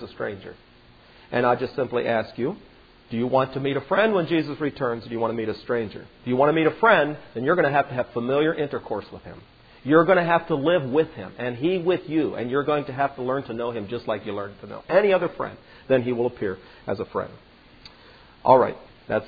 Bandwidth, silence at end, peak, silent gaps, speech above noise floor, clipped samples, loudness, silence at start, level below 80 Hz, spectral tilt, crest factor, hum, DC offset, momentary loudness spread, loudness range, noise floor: 5 kHz; 0 s; -2 dBFS; none; 28 dB; under 0.1%; -23 LUFS; 0 s; -58 dBFS; -9 dB/octave; 22 dB; none; under 0.1%; 14 LU; 4 LU; -51 dBFS